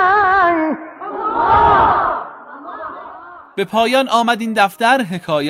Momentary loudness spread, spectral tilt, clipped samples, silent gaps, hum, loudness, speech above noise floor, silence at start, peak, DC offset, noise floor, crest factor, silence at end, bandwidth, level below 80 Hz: 20 LU; -4.5 dB/octave; under 0.1%; none; none; -14 LUFS; 21 dB; 0 s; 0 dBFS; under 0.1%; -36 dBFS; 16 dB; 0 s; 16 kHz; -40 dBFS